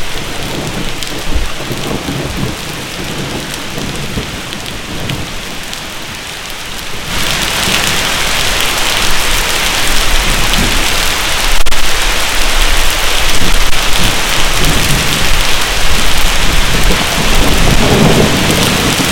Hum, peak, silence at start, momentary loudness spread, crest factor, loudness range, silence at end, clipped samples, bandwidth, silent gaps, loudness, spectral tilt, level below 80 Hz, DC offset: none; 0 dBFS; 0 s; 11 LU; 10 dB; 9 LU; 0 s; 1%; 17.5 kHz; none; -12 LUFS; -2.5 dB/octave; -18 dBFS; under 0.1%